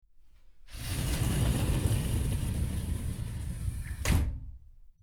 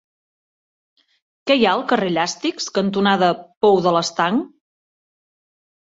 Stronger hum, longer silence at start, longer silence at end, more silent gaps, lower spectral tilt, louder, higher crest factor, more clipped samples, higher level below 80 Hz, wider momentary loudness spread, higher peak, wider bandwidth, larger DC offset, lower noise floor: neither; second, 0.2 s vs 1.45 s; second, 0.15 s vs 1.4 s; second, none vs 3.57-3.61 s; about the same, -5.5 dB/octave vs -4.5 dB/octave; second, -32 LUFS vs -18 LUFS; about the same, 16 dB vs 18 dB; neither; first, -36 dBFS vs -64 dBFS; about the same, 9 LU vs 7 LU; second, -14 dBFS vs -2 dBFS; first, 20 kHz vs 7.8 kHz; neither; second, -54 dBFS vs under -90 dBFS